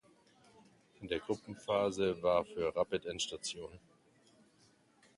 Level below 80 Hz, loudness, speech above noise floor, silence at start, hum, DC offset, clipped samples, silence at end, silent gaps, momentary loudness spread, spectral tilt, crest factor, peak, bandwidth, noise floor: -66 dBFS; -36 LUFS; 33 dB; 1 s; none; under 0.1%; under 0.1%; 1.4 s; none; 10 LU; -4 dB/octave; 20 dB; -18 dBFS; 11.5 kHz; -69 dBFS